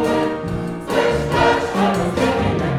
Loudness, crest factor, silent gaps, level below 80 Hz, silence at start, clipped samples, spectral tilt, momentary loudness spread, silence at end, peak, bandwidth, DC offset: -19 LUFS; 16 dB; none; -36 dBFS; 0 s; under 0.1%; -6 dB/octave; 7 LU; 0 s; -2 dBFS; 15.5 kHz; under 0.1%